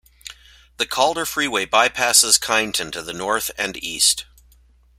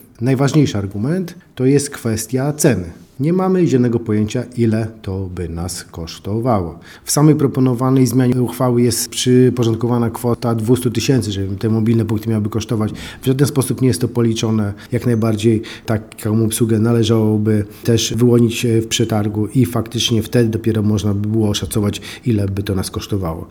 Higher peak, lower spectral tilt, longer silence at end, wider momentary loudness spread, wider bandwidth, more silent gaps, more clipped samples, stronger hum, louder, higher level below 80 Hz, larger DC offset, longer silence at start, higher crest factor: about the same, 0 dBFS vs 0 dBFS; second, 0 dB/octave vs -6 dB/octave; first, 0.75 s vs 0 s; first, 13 LU vs 8 LU; second, 16 kHz vs 18 kHz; neither; neither; neither; about the same, -18 LUFS vs -17 LUFS; second, -52 dBFS vs -44 dBFS; neither; about the same, 0.25 s vs 0.2 s; first, 22 dB vs 16 dB